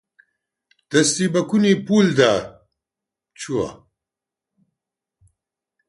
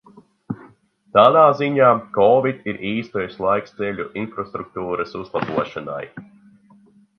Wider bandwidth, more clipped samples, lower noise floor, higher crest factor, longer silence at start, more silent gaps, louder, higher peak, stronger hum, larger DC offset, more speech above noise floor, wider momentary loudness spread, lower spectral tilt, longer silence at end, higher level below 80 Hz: first, 11.5 kHz vs 6.6 kHz; neither; first, -87 dBFS vs -52 dBFS; about the same, 20 dB vs 20 dB; first, 0.9 s vs 0.5 s; neither; about the same, -19 LUFS vs -19 LUFS; about the same, -2 dBFS vs 0 dBFS; neither; neither; first, 69 dB vs 33 dB; second, 13 LU vs 17 LU; second, -4.5 dB/octave vs -8 dB/octave; first, 2.15 s vs 0.95 s; about the same, -58 dBFS vs -58 dBFS